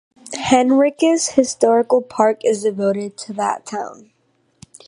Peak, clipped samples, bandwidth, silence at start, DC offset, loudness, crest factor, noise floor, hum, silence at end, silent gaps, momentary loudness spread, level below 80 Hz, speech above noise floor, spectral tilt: 0 dBFS; under 0.1%; 11.5 kHz; 0.25 s; under 0.1%; -17 LUFS; 18 dB; -53 dBFS; none; 0.95 s; none; 13 LU; -58 dBFS; 36 dB; -4 dB/octave